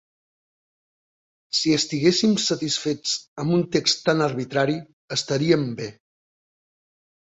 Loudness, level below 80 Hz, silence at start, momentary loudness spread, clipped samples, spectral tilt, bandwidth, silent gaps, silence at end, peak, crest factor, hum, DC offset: -22 LUFS; -62 dBFS; 1.55 s; 8 LU; under 0.1%; -4 dB/octave; 8.2 kHz; 3.28-3.36 s, 4.93-5.08 s; 1.45 s; -4 dBFS; 20 dB; none; under 0.1%